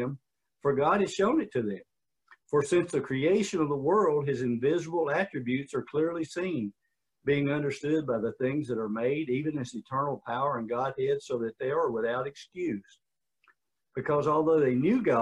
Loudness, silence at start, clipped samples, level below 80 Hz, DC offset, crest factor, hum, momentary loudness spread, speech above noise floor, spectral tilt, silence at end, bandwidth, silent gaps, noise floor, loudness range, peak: -29 LUFS; 0 s; under 0.1%; -68 dBFS; under 0.1%; 16 dB; none; 9 LU; 41 dB; -6.5 dB/octave; 0 s; 11 kHz; none; -69 dBFS; 4 LU; -14 dBFS